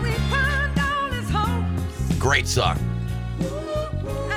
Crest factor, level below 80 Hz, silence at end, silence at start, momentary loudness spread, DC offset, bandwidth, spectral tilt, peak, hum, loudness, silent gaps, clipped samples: 18 dB; -32 dBFS; 0 s; 0 s; 8 LU; under 0.1%; 18 kHz; -5 dB/octave; -6 dBFS; none; -23 LUFS; none; under 0.1%